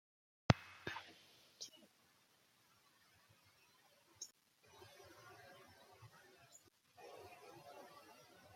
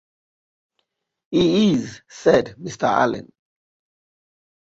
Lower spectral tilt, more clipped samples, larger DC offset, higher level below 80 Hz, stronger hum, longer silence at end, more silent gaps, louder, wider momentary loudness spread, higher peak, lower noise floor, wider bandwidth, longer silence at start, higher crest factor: about the same, -5 dB/octave vs -6 dB/octave; neither; neither; second, -68 dBFS vs -56 dBFS; neither; second, 0 s vs 1.45 s; neither; second, -45 LUFS vs -19 LUFS; first, 27 LU vs 14 LU; second, -12 dBFS vs -2 dBFS; about the same, -74 dBFS vs -74 dBFS; first, 16.5 kHz vs 8 kHz; second, 0.5 s vs 1.3 s; first, 38 dB vs 20 dB